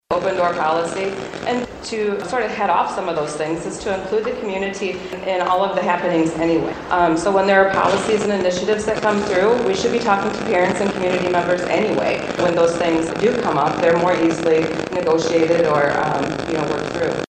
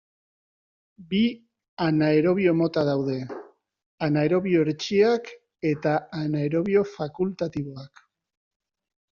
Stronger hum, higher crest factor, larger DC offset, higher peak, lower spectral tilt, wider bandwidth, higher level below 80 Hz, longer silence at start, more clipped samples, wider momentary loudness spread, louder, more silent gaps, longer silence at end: neither; about the same, 18 dB vs 16 dB; neither; first, 0 dBFS vs -8 dBFS; about the same, -5 dB/octave vs -6 dB/octave; first, 9.4 kHz vs 7.2 kHz; first, -48 dBFS vs -64 dBFS; second, 0.1 s vs 1 s; neither; second, 7 LU vs 12 LU; first, -19 LUFS vs -24 LUFS; second, none vs 1.68-1.77 s, 3.86-3.98 s; second, 0.05 s vs 1.25 s